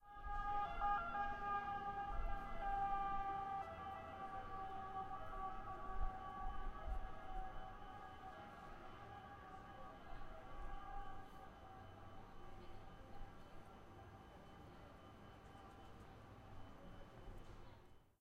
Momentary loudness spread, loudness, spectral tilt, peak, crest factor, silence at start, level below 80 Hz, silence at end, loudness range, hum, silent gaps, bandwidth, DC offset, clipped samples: 17 LU; -49 LUFS; -6 dB/octave; -30 dBFS; 18 dB; 0 s; -54 dBFS; 0.1 s; 16 LU; none; none; 7.8 kHz; under 0.1%; under 0.1%